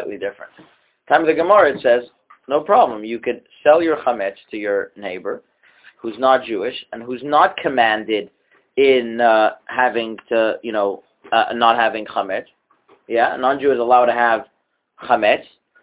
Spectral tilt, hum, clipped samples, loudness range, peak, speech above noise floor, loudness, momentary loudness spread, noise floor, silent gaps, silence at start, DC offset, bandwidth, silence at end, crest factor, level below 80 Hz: -7.5 dB/octave; none; under 0.1%; 4 LU; 0 dBFS; 38 dB; -18 LUFS; 13 LU; -56 dBFS; none; 0 s; under 0.1%; 4 kHz; 0.4 s; 18 dB; -62 dBFS